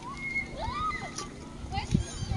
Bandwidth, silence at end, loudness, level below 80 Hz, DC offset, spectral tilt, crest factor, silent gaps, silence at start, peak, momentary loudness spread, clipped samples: 11.5 kHz; 0 s; -33 LUFS; -42 dBFS; under 0.1%; -4.5 dB/octave; 22 dB; none; 0 s; -12 dBFS; 8 LU; under 0.1%